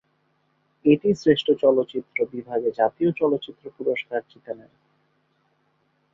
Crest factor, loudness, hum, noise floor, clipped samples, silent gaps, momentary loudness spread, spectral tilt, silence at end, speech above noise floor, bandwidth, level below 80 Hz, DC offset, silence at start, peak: 20 dB; -23 LUFS; none; -68 dBFS; under 0.1%; none; 18 LU; -7 dB/octave; 1.55 s; 46 dB; 7.4 kHz; -64 dBFS; under 0.1%; 0.85 s; -4 dBFS